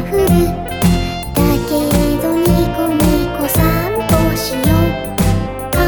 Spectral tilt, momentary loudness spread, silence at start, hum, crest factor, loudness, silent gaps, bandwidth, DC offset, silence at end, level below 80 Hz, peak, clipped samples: -6 dB/octave; 4 LU; 0 s; none; 14 dB; -15 LUFS; none; 19.5 kHz; 0.4%; 0 s; -24 dBFS; 0 dBFS; under 0.1%